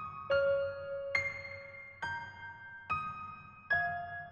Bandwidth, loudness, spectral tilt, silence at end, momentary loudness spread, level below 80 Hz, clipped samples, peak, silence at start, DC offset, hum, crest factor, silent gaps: 7.2 kHz; -36 LUFS; -4.5 dB/octave; 0 s; 15 LU; -68 dBFS; under 0.1%; -18 dBFS; 0 s; under 0.1%; none; 20 dB; none